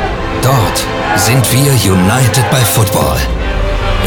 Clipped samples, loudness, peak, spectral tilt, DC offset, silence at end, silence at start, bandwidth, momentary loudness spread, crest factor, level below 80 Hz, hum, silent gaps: under 0.1%; -11 LUFS; 0 dBFS; -4.5 dB/octave; under 0.1%; 0 s; 0 s; 19 kHz; 7 LU; 10 dB; -20 dBFS; none; none